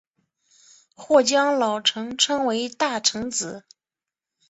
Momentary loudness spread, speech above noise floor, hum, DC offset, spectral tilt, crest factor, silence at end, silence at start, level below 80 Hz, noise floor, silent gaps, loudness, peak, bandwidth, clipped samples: 9 LU; 68 dB; none; under 0.1%; -1.5 dB/octave; 20 dB; 0.9 s; 1 s; -66 dBFS; -90 dBFS; none; -21 LUFS; -4 dBFS; 8.2 kHz; under 0.1%